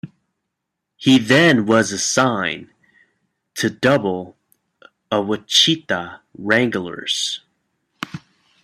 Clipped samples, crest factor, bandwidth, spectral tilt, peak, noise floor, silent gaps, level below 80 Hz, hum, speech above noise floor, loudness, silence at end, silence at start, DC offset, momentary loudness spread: under 0.1%; 20 dB; 14.5 kHz; -3.5 dB/octave; 0 dBFS; -79 dBFS; none; -60 dBFS; none; 62 dB; -17 LUFS; 0.45 s; 0.05 s; under 0.1%; 19 LU